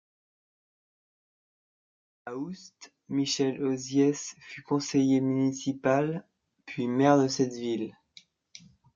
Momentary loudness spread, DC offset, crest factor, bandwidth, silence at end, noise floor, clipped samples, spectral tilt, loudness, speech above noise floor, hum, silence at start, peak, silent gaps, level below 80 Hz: 16 LU; under 0.1%; 22 dB; 7.6 kHz; 1.05 s; -58 dBFS; under 0.1%; -5.5 dB/octave; -28 LUFS; 31 dB; none; 2.25 s; -8 dBFS; none; -74 dBFS